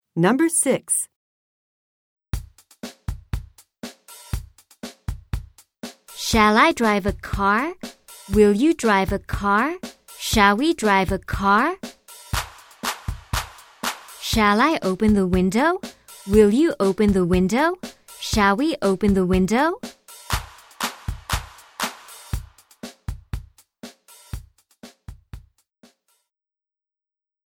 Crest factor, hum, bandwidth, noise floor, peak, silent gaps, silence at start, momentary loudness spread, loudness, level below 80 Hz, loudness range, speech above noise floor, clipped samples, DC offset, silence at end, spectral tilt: 20 dB; none; 17.5 kHz; under -90 dBFS; -2 dBFS; 1.16-2.17 s; 0.15 s; 22 LU; -20 LUFS; -38 dBFS; 17 LU; over 71 dB; under 0.1%; under 0.1%; 2.1 s; -4.5 dB/octave